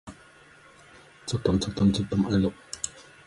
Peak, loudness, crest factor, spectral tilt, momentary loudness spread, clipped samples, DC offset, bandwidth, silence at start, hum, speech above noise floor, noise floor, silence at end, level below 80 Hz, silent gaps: -10 dBFS; -27 LUFS; 18 dB; -6 dB/octave; 12 LU; under 0.1%; under 0.1%; 11.5 kHz; 0.05 s; none; 29 dB; -53 dBFS; 0.25 s; -46 dBFS; none